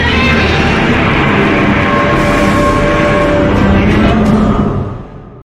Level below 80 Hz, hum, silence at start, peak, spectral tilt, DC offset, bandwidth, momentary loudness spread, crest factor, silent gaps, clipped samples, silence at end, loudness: -20 dBFS; none; 0 s; 0 dBFS; -6.5 dB/octave; under 0.1%; 13 kHz; 3 LU; 10 dB; none; under 0.1%; 0.1 s; -10 LUFS